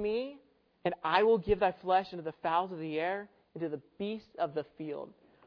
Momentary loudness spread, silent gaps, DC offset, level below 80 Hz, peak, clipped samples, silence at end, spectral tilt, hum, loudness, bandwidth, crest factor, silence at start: 14 LU; none; under 0.1%; -58 dBFS; -12 dBFS; under 0.1%; 0.4 s; -8 dB/octave; none; -33 LUFS; 5.4 kHz; 20 dB; 0 s